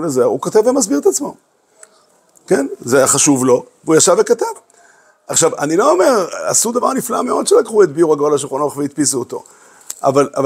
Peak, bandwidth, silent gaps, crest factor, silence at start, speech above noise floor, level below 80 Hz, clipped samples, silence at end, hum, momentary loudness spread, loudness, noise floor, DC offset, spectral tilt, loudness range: 0 dBFS; 16 kHz; none; 14 dB; 0 s; 39 dB; -64 dBFS; under 0.1%; 0 s; none; 9 LU; -14 LUFS; -53 dBFS; under 0.1%; -3.5 dB/octave; 2 LU